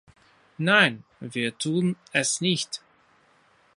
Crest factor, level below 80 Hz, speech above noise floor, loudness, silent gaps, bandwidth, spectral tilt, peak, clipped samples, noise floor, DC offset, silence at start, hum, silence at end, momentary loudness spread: 22 dB; -70 dBFS; 36 dB; -24 LUFS; none; 11.5 kHz; -3.5 dB/octave; -4 dBFS; under 0.1%; -61 dBFS; under 0.1%; 0.6 s; none; 1 s; 15 LU